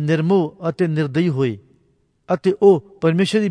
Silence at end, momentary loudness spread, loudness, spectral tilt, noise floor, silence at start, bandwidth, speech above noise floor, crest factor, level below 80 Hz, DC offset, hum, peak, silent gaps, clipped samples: 0 s; 9 LU; -18 LUFS; -7.5 dB/octave; -62 dBFS; 0 s; 10.5 kHz; 44 dB; 16 dB; -60 dBFS; under 0.1%; none; -2 dBFS; none; under 0.1%